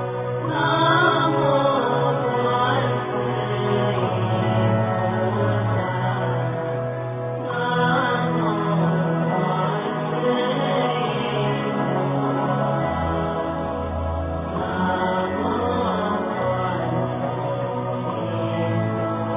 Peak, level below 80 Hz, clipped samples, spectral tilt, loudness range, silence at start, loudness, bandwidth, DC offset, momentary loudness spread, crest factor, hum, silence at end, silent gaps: -6 dBFS; -42 dBFS; under 0.1%; -11 dB/octave; 4 LU; 0 s; -22 LUFS; 3.8 kHz; under 0.1%; 7 LU; 14 dB; none; 0 s; none